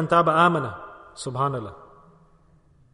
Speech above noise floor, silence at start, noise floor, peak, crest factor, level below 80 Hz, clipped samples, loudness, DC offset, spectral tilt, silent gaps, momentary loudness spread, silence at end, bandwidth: 35 dB; 0 s; -57 dBFS; -6 dBFS; 20 dB; -58 dBFS; under 0.1%; -22 LUFS; under 0.1%; -6 dB/octave; none; 22 LU; 1.2 s; 10.5 kHz